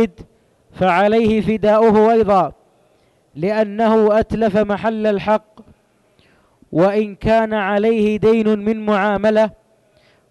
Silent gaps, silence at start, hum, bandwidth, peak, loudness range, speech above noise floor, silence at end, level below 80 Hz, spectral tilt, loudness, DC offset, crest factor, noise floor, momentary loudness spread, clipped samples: none; 0 s; none; 9.6 kHz; -4 dBFS; 3 LU; 42 dB; 0.8 s; -44 dBFS; -7.5 dB/octave; -16 LUFS; under 0.1%; 12 dB; -57 dBFS; 7 LU; under 0.1%